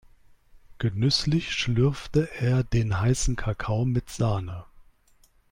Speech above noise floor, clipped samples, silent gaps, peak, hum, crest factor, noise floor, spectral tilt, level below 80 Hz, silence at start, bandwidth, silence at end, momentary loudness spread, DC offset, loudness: 36 dB; under 0.1%; none; -10 dBFS; none; 16 dB; -60 dBFS; -5.5 dB/octave; -40 dBFS; 0.55 s; 15.5 kHz; 0.9 s; 7 LU; under 0.1%; -26 LUFS